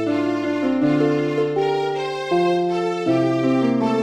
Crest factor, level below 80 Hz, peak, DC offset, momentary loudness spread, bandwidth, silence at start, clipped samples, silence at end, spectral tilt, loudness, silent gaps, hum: 12 dB; -66 dBFS; -8 dBFS; under 0.1%; 3 LU; 9.8 kHz; 0 s; under 0.1%; 0 s; -7 dB/octave; -20 LUFS; none; none